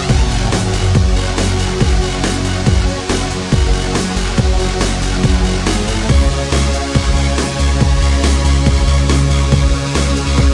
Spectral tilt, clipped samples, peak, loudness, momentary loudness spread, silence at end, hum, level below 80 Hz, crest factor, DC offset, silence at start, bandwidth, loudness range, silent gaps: -5 dB/octave; under 0.1%; 0 dBFS; -15 LUFS; 3 LU; 0 s; none; -16 dBFS; 12 dB; under 0.1%; 0 s; 11.5 kHz; 2 LU; none